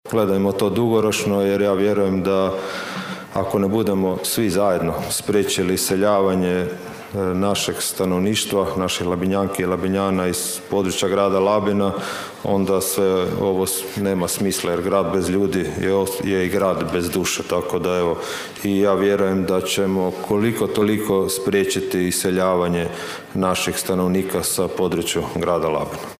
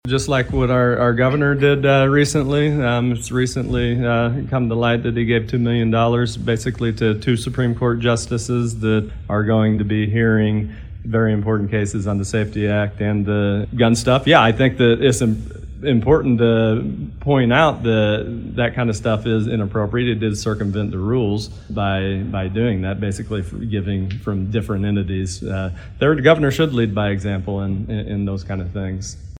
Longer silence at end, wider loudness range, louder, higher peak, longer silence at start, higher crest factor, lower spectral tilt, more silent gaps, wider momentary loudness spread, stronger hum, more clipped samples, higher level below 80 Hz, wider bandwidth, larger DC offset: about the same, 0.05 s vs 0 s; second, 1 LU vs 5 LU; about the same, -20 LUFS vs -19 LUFS; second, -6 dBFS vs 0 dBFS; about the same, 0.05 s vs 0.05 s; about the same, 14 dB vs 18 dB; second, -4.5 dB/octave vs -6.5 dB/octave; neither; second, 5 LU vs 10 LU; neither; neither; second, -50 dBFS vs -36 dBFS; about the same, 16 kHz vs 15 kHz; neither